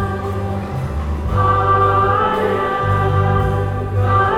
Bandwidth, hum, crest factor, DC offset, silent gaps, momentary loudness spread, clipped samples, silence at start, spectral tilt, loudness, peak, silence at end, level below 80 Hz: 9.2 kHz; none; 14 dB; under 0.1%; none; 9 LU; under 0.1%; 0 s; -8 dB/octave; -17 LUFS; -4 dBFS; 0 s; -28 dBFS